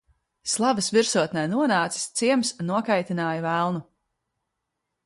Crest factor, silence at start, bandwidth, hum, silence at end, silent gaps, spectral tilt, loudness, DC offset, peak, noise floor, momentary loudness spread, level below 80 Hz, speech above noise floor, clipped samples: 18 dB; 0.45 s; 11.5 kHz; none; 1.25 s; none; -4 dB/octave; -24 LUFS; under 0.1%; -6 dBFS; -81 dBFS; 6 LU; -68 dBFS; 57 dB; under 0.1%